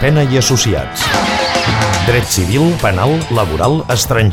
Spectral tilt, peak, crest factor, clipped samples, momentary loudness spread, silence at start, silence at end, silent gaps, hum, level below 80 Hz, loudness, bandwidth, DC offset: -4.5 dB/octave; 0 dBFS; 12 dB; under 0.1%; 3 LU; 0 s; 0 s; none; none; -30 dBFS; -13 LUFS; 18 kHz; under 0.1%